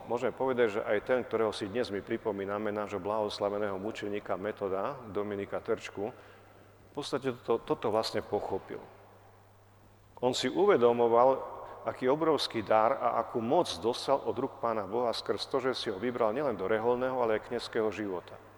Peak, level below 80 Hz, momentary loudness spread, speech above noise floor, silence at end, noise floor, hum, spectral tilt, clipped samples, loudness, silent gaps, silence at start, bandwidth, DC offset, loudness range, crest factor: -12 dBFS; -66 dBFS; 11 LU; 28 dB; 0.05 s; -59 dBFS; none; -5 dB/octave; under 0.1%; -31 LUFS; none; 0 s; 19 kHz; under 0.1%; 8 LU; 20 dB